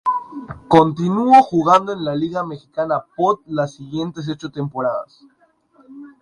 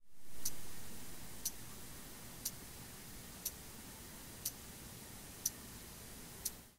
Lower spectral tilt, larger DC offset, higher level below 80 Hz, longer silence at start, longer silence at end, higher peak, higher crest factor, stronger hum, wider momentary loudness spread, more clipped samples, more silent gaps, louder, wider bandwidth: first, -7 dB/octave vs -2 dB/octave; neither; first, -56 dBFS vs -62 dBFS; about the same, 0.05 s vs 0 s; about the same, 0.1 s vs 0 s; first, 0 dBFS vs -18 dBFS; second, 18 dB vs 26 dB; neither; first, 15 LU vs 9 LU; neither; neither; first, -18 LUFS vs -47 LUFS; second, 10.5 kHz vs 16 kHz